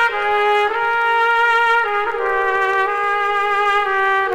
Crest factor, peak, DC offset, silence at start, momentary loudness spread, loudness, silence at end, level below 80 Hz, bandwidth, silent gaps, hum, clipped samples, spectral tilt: 12 dB; -4 dBFS; under 0.1%; 0 s; 4 LU; -16 LUFS; 0 s; -50 dBFS; 16.5 kHz; none; none; under 0.1%; -2 dB/octave